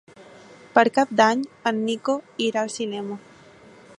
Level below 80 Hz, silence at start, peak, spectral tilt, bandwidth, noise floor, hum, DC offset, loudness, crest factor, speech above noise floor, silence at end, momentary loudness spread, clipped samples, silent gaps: -72 dBFS; 0.2 s; -2 dBFS; -4 dB/octave; 11.5 kHz; -49 dBFS; none; under 0.1%; -22 LUFS; 22 dB; 27 dB; 0.8 s; 12 LU; under 0.1%; none